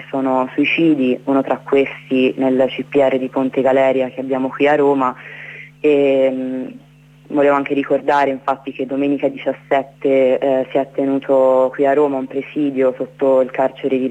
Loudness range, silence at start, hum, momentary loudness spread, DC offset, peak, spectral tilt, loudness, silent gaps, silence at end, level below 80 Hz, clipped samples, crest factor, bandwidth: 2 LU; 0 s; none; 9 LU; under 0.1%; -4 dBFS; -7 dB/octave; -17 LUFS; none; 0 s; -62 dBFS; under 0.1%; 12 dB; 8.2 kHz